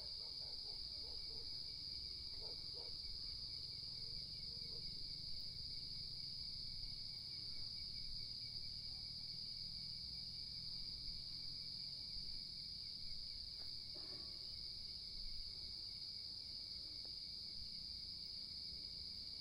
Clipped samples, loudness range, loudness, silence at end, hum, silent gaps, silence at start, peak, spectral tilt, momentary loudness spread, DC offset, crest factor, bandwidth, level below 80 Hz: under 0.1%; 1 LU; -47 LUFS; 0 s; none; none; 0 s; -34 dBFS; -2.5 dB/octave; 1 LU; under 0.1%; 14 dB; 15.5 kHz; -62 dBFS